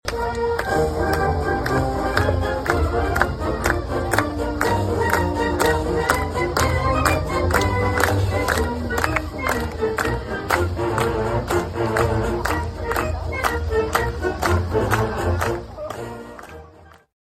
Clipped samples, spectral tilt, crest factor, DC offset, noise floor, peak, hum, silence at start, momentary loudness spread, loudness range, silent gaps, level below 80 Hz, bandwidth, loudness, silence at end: under 0.1%; -5.5 dB/octave; 22 dB; under 0.1%; -47 dBFS; 0 dBFS; none; 0.05 s; 5 LU; 3 LU; none; -30 dBFS; 16.5 kHz; -21 LUFS; 0.3 s